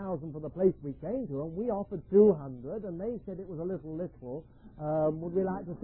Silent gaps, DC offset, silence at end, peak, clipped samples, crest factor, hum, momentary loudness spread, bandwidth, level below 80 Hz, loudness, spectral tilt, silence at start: none; under 0.1%; 0 s; -12 dBFS; under 0.1%; 20 dB; none; 16 LU; 3 kHz; -56 dBFS; -32 LUFS; -11.5 dB/octave; 0 s